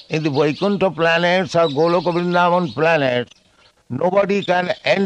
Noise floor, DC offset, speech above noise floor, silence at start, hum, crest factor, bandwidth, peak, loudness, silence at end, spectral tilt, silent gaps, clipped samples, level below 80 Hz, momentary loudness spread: -55 dBFS; under 0.1%; 38 dB; 0.1 s; none; 16 dB; 9.4 kHz; -2 dBFS; -17 LUFS; 0 s; -6 dB/octave; none; under 0.1%; -60 dBFS; 5 LU